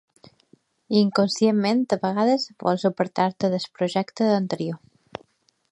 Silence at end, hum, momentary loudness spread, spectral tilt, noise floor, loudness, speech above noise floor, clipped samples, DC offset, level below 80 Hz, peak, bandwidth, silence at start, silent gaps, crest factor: 0.95 s; none; 15 LU; -6 dB/octave; -62 dBFS; -23 LUFS; 40 dB; under 0.1%; under 0.1%; -70 dBFS; -6 dBFS; 10.5 kHz; 0.9 s; none; 18 dB